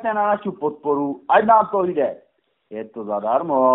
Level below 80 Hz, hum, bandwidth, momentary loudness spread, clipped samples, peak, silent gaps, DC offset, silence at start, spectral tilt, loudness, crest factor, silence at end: -66 dBFS; none; 4 kHz; 18 LU; under 0.1%; -2 dBFS; none; under 0.1%; 0 s; -4.5 dB/octave; -20 LUFS; 18 dB; 0 s